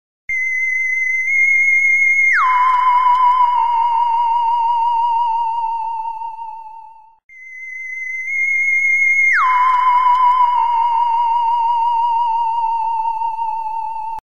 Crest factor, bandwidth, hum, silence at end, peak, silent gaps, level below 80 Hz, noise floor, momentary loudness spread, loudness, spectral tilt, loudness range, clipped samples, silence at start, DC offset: 10 dB; 11.5 kHz; none; 0.05 s; -4 dBFS; 7.24-7.29 s; -58 dBFS; -39 dBFS; 13 LU; -14 LUFS; 2 dB/octave; 8 LU; under 0.1%; 0.3 s; 2%